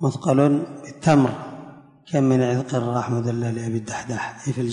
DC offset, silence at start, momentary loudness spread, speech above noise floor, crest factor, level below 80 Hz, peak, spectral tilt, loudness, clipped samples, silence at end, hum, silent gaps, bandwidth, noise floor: under 0.1%; 0 s; 11 LU; 22 dB; 18 dB; -58 dBFS; -4 dBFS; -7 dB/octave; -22 LUFS; under 0.1%; 0 s; none; none; 10.5 kHz; -43 dBFS